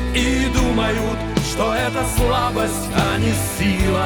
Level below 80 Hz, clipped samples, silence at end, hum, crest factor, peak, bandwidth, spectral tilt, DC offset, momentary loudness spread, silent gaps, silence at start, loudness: -26 dBFS; under 0.1%; 0 s; none; 16 dB; -2 dBFS; over 20 kHz; -5 dB/octave; under 0.1%; 3 LU; none; 0 s; -19 LUFS